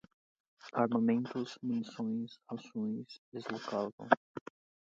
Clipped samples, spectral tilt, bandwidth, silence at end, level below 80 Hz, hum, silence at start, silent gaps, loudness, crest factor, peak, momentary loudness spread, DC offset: under 0.1%; -6.5 dB/octave; 7.6 kHz; 0.5 s; -82 dBFS; none; 0.65 s; 3.18-3.32 s, 3.93-3.98 s, 4.17-4.35 s; -36 LUFS; 30 dB; -8 dBFS; 16 LU; under 0.1%